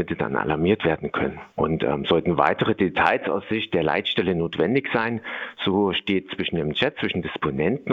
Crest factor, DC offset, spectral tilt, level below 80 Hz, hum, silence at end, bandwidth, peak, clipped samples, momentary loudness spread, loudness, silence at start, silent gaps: 22 dB; under 0.1%; -7.5 dB/octave; -52 dBFS; none; 0 s; 7.4 kHz; -2 dBFS; under 0.1%; 6 LU; -23 LUFS; 0 s; none